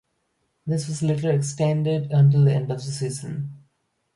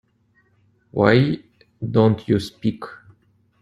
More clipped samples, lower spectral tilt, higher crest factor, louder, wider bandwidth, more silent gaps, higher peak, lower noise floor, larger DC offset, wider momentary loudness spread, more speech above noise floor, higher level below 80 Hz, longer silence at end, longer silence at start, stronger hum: neither; about the same, -7 dB/octave vs -8 dB/octave; second, 14 dB vs 20 dB; about the same, -22 LUFS vs -20 LUFS; about the same, 11.5 kHz vs 12 kHz; neither; second, -8 dBFS vs -2 dBFS; first, -72 dBFS vs -62 dBFS; neither; second, 14 LU vs 17 LU; first, 51 dB vs 44 dB; second, -60 dBFS vs -52 dBFS; about the same, 0.6 s vs 0.65 s; second, 0.65 s vs 0.95 s; neither